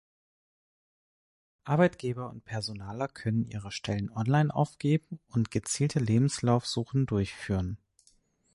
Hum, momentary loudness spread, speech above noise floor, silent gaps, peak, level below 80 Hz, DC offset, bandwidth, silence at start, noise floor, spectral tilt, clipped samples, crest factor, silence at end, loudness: none; 10 LU; 38 dB; none; -10 dBFS; -54 dBFS; under 0.1%; 11.5 kHz; 1.65 s; -67 dBFS; -6 dB/octave; under 0.1%; 20 dB; 0.8 s; -30 LUFS